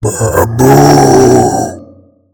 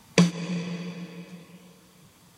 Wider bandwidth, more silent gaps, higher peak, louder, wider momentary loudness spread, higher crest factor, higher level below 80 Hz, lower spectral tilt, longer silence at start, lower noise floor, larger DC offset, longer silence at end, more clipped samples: first, 19.5 kHz vs 12.5 kHz; neither; first, 0 dBFS vs -4 dBFS; first, -7 LUFS vs -28 LUFS; second, 9 LU vs 24 LU; second, 8 dB vs 26 dB; first, -32 dBFS vs -68 dBFS; about the same, -5.5 dB/octave vs -5.5 dB/octave; second, 0 s vs 0.15 s; second, -40 dBFS vs -55 dBFS; neither; second, 0.5 s vs 0.7 s; first, 6% vs under 0.1%